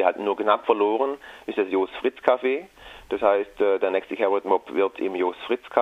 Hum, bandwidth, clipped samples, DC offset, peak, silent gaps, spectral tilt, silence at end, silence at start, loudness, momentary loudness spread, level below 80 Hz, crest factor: none; 7.6 kHz; under 0.1%; under 0.1%; -4 dBFS; none; -5.5 dB/octave; 0 s; 0 s; -24 LUFS; 7 LU; -60 dBFS; 20 dB